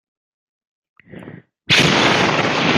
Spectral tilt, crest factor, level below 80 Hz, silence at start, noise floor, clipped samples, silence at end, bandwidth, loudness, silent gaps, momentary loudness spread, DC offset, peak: -3.5 dB/octave; 18 dB; -52 dBFS; 1.15 s; -39 dBFS; under 0.1%; 0 s; 15.5 kHz; -14 LUFS; none; 4 LU; under 0.1%; 0 dBFS